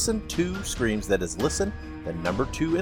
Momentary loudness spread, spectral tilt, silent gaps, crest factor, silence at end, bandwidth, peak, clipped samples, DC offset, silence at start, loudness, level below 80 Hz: 5 LU; -4.5 dB/octave; none; 16 dB; 0 s; 18 kHz; -10 dBFS; under 0.1%; under 0.1%; 0 s; -27 LUFS; -38 dBFS